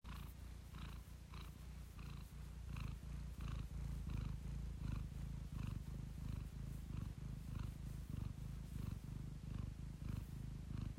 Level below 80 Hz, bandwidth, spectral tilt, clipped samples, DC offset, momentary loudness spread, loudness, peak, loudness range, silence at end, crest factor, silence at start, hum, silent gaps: -52 dBFS; 16 kHz; -6.5 dB/octave; under 0.1%; under 0.1%; 7 LU; -51 LUFS; -34 dBFS; 3 LU; 0 s; 14 dB; 0.05 s; none; none